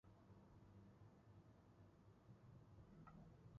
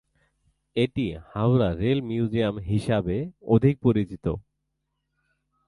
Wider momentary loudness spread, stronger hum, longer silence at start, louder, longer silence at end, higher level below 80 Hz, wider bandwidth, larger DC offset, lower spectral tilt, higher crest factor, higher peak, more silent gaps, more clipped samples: second, 4 LU vs 9 LU; neither; second, 0.05 s vs 0.75 s; second, -68 LUFS vs -25 LUFS; second, 0 s vs 1.3 s; second, -76 dBFS vs -46 dBFS; second, 6.8 kHz vs 11.5 kHz; neither; about the same, -8 dB/octave vs -8.5 dB/octave; about the same, 16 dB vs 20 dB; second, -50 dBFS vs -6 dBFS; neither; neither